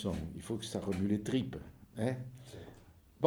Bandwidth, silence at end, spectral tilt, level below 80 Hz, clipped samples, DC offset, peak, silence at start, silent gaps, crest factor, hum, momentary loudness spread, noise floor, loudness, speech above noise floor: over 20 kHz; 0 s; -6.5 dB/octave; -58 dBFS; under 0.1%; under 0.1%; -12 dBFS; 0 s; none; 24 dB; none; 17 LU; -59 dBFS; -37 LUFS; 22 dB